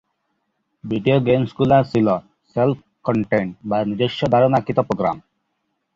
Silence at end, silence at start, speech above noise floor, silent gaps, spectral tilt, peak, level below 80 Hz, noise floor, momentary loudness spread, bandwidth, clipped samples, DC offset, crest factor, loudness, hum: 0.75 s; 0.85 s; 55 dB; none; -8.5 dB/octave; -2 dBFS; -52 dBFS; -73 dBFS; 10 LU; 7.6 kHz; under 0.1%; under 0.1%; 18 dB; -19 LUFS; none